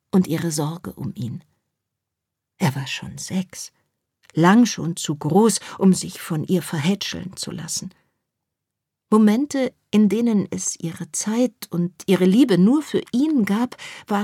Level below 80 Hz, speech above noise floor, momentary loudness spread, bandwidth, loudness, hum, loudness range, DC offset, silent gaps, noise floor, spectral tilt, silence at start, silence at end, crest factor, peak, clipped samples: -62 dBFS; 63 dB; 14 LU; 16 kHz; -21 LUFS; none; 8 LU; under 0.1%; none; -83 dBFS; -5.5 dB/octave; 0.15 s; 0 s; 18 dB; -4 dBFS; under 0.1%